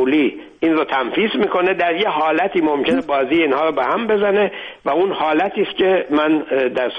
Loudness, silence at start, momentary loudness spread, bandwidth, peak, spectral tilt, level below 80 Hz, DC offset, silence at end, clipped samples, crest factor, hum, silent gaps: -17 LUFS; 0 s; 3 LU; 5.8 kHz; -6 dBFS; -7 dB/octave; -56 dBFS; under 0.1%; 0 s; under 0.1%; 10 dB; none; none